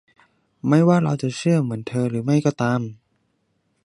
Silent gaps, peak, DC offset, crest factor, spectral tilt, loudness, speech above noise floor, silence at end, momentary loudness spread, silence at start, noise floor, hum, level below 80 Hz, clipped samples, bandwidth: none; -2 dBFS; under 0.1%; 18 dB; -7.5 dB/octave; -21 LUFS; 49 dB; 0.9 s; 9 LU; 0.65 s; -69 dBFS; none; -62 dBFS; under 0.1%; 11 kHz